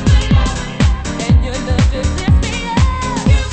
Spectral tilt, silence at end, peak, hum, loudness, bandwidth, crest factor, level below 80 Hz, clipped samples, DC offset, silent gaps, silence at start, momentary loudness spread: -5.5 dB/octave; 0 s; 0 dBFS; none; -15 LUFS; 8.8 kHz; 12 dB; -16 dBFS; under 0.1%; under 0.1%; none; 0 s; 4 LU